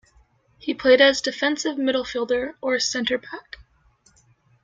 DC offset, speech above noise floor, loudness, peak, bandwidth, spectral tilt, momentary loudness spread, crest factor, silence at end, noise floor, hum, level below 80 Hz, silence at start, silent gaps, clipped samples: under 0.1%; 39 dB; -21 LUFS; -2 dBFS; 7.8 kHz; -2 dB/octave; 15 LU; 20 dB; 1 s; -60 dBFS; none; -58 dBFS; 0.65 s; none; under 0.1%